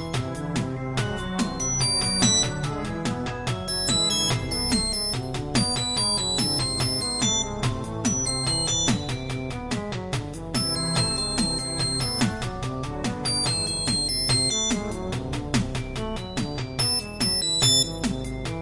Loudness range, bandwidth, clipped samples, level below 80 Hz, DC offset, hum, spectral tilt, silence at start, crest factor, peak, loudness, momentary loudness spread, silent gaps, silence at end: 3 LU; 11.5 kHz; under 0.1%; -40 dBFS; under 0.1%; none; -3 dB/octave; 0 s; 18 dB; -6 dBFS; -24 LUFS; 10 LU; none; 0 s